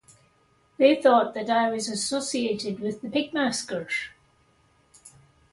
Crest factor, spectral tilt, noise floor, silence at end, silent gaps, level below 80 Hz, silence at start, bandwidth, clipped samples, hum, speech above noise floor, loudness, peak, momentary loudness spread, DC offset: 20 dB; -3.5 dB/octave; -64 dBFS; 0.45 s; none; -68 dBFS; 0.8 s; 11.5 kHz; under 0.1%; none; 39 dB; -25 LUFS; -6 dBFS; 11 LU; under 0.1%